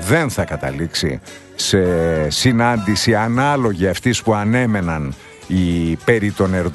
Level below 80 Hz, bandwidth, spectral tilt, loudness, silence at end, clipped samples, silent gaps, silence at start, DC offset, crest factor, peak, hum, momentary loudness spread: -38 dBFS; 12.5 kHz; -5 dB/octave; -17 LUFS; 0 s; under 0.1%; none; 0 s; under 0.1%; 16 dB; 0 dBFS; none; 7 LU